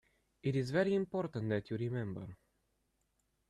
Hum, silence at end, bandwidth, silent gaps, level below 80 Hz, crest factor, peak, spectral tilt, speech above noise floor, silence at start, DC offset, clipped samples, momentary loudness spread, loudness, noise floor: none; 1.15 s; 12 kHz; none; -70 dBFS; 18 dB; -20 dBFS; -8 dB/octave; 44 dB; 0.45 s; under 0.1%; under 0.1%; 11 LU; -37 LUFS; -80 dBFS